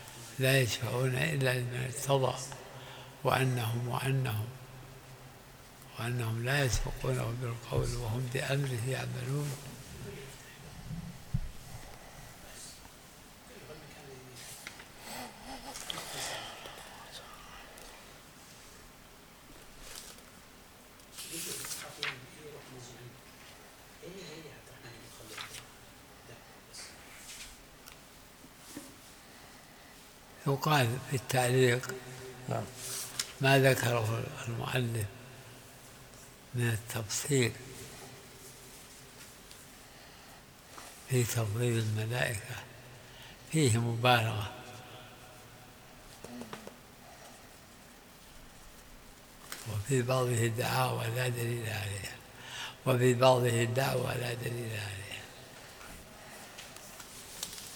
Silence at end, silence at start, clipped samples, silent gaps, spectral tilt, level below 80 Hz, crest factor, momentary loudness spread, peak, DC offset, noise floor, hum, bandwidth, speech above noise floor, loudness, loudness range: 0 s; 0 s; under 0.1%; none; -4.5 dB/octave; -54 dBFS; 26 dB; 23 LU; -10 dBFS; under 0.1%; -55 dBFS; none; over 20 kHz; 24 dB; -33 LUFS; 18 LU